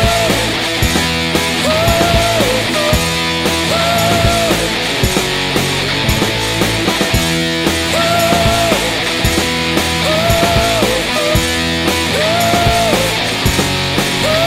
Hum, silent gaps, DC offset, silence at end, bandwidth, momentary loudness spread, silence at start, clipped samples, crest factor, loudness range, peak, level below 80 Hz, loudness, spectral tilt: none; none; 0.5%; 0 s; 16.5 kHz; 3 LU; 0 s; under 0.1%; 14 dB; 1 LU; 0 dBFS; -26 dBFS; -13 LUFS; -3.5 dB/octave